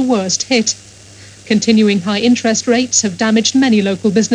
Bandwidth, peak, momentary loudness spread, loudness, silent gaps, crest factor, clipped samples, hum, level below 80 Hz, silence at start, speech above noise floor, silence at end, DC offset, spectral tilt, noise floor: 10 kHz; -2 dBFS; 4 LU; -13 LUFS; none; 12 dB; under 0.1%; none; -56 dBFS; 0 s; 25 dB; 0 s; under 0.1%; -3.5 dB/octave; -38 dBFS